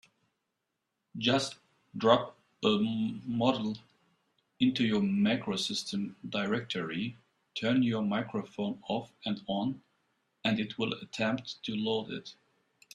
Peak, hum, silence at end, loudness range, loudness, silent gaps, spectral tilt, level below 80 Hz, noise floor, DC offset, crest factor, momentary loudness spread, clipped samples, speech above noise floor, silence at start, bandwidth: -8 dBFS; none; 0.6 s; 4 LU; -32 LUFS; none; -5.5 dB/octave; -70 dBFS; -84 dBFS; under 0.1%; 24 dB; 10 LU; under 0.1%; 53 dB; 1.15 s; 11.5 kHz